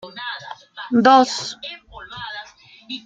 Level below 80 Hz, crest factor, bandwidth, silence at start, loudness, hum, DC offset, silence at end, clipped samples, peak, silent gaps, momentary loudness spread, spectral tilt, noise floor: -58 dBFS; 20 dB; 9.2 kHz; 0.05 s; -17 LUFS; none; under 0.1%; 0.05 s; under 0.1%; -2 dBFS; none; 23 LU; -3.5 dB/octave; -44 dBFS